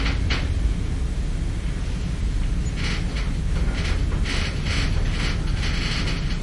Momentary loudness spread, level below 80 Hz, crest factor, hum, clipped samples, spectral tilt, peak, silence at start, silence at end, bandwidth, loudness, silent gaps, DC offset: 4 LU; -24 dBFS; 14 dB; none; under 0.1%; -5 dB/octave; -10 dBFS; 0 s; 0 s; 11.5 kHz; -26 LUFS; none; under 0.1%